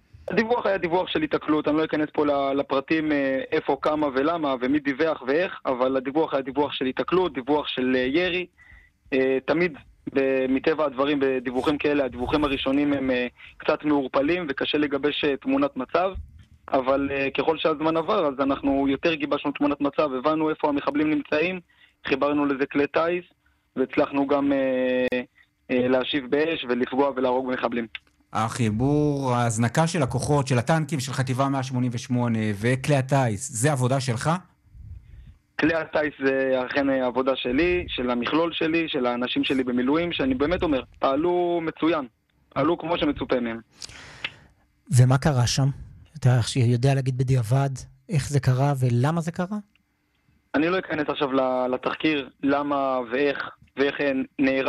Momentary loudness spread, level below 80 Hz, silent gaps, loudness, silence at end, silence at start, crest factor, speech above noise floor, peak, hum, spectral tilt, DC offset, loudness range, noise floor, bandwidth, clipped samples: 5 LU; -50 dBFS; none; -24 LUFS; 0 s; 0.3 s; 18 dB; 46 dB; -6 dBFS; none; -6 dB/octave; under 0.1%; 2 LU; -69 dBFS; 13 kHz; under 0.1%